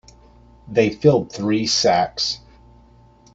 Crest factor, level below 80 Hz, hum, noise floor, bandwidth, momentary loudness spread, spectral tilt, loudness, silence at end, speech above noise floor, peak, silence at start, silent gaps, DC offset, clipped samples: 20 dB; -52 dBFS; none; -50 dBFS; 8 kHz; 7 LU; -4.5 dB/octave; -19 LUFS; 1 s; 32 dB; -2 dBFS; 0.65 s; none; under 0.1%; under 0.1%